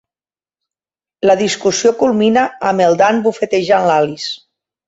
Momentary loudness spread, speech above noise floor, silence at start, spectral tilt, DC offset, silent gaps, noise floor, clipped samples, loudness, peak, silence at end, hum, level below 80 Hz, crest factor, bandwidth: 6 LU; over 77 dB; 1.25 s; -4 dB/octave; under 0.1%; none; under -90 dBFS; under 0.1%; -14 LUFS; 0 dBFS; 0.5 s; none; -58 dBFS; 14 dB; 8 kHz